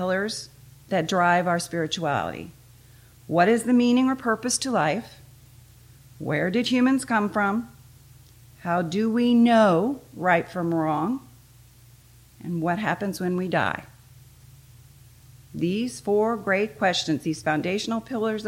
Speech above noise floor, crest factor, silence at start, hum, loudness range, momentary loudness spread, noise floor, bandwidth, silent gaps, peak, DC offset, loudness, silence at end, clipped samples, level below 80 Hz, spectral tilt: 29 dB; 18 dB; 0 s; none; 7 LU; 12 LU; -52 dBFS; 16.5 kHz; none; -8 dBFS; under 0.1%; -24 LUFS; 0 s; under 0.1%; -60 dBFS; -5 dB/octave